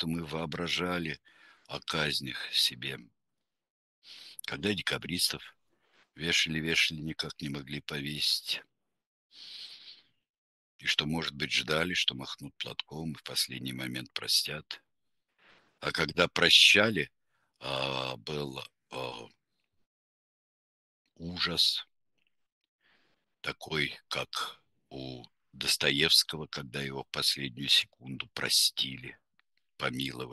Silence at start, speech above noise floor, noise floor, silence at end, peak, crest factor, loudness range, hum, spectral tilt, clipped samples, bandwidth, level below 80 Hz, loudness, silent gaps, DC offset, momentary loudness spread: 0 s; 56 dB; -88 dBFS; 0 s; -6 dBFS; 26 dB; 11 LU; none; -2.5 dB/octave; under 0.1%; 12.5 kHz; -62 dBFS; -29 LUFS; 3.70-4.02 s, 9.06-9.30 s, 10.30-10.79 s, 19.86-21.05 s, 22.52-22.61 s, 22.68-22.79 s; under 0.1%; 18 LU